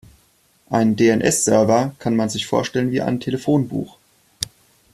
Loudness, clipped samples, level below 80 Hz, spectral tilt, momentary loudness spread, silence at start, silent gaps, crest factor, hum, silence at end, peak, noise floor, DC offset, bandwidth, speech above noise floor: -19 LUFS; under 0.1%; -54 dBFS; -5 dB/octave; 13 LU; 0.7 s; none; 18 dB; none; 0.5 s; -2 dBFS; -59 dBFS; under 0.1%; 14.5 kHz; 40 dB